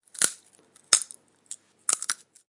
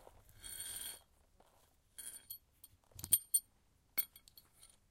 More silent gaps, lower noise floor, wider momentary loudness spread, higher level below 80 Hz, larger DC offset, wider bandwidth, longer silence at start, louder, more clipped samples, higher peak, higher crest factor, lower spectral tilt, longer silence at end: neither; second, -59 dBFS vs -73 dBFS; second, 20 LU vs 23 LU; about the same, -72 dBFS vs -70 dBFS; neither; second, 11.5 kHz vs 17 kHz; first, 0.15 s vs 0 s; first, -25 LUFS vs -38 LUFS; neither; first, 0 dBFS vs -16 dBFS; about the same, 30 dB vs 30 dB; second, 2 dB/octave vs 0.5 dB/octave; about the same, 0.35 s vs 0.25 s